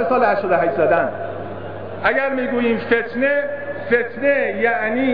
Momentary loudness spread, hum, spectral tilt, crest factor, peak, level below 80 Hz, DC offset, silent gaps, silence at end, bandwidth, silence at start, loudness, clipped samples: 11 LU; none; -9 dB/octave; 14 dB; -4 dBFS; -56 dBFS; 1%; none; 0 s; 5.2 kHz; 0 s; -19 LUFS; under 0.1%